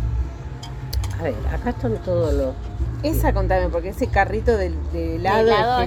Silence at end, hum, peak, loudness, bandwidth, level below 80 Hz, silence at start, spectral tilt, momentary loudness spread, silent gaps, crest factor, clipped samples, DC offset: 0 s; none; -4 dBFS; -22 LUFS; 18 kHz; -26 dBFS; 0 s; -6.5 dB/octave; 11 LU; none; 16 dB; under 0.1%; under 0.1%